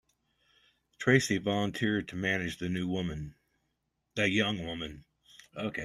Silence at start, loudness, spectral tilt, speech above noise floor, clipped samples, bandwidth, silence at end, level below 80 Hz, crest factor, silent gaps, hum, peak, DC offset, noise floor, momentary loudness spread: 1 s; -31 LUFS; -5 dB/octave; 50 dB; under 0.1%; 13 kHz; 0 s; -60 dBFS; 24 dB; none; none; -10 dBFS; under 0.1%; -81 dBFS; 15 LU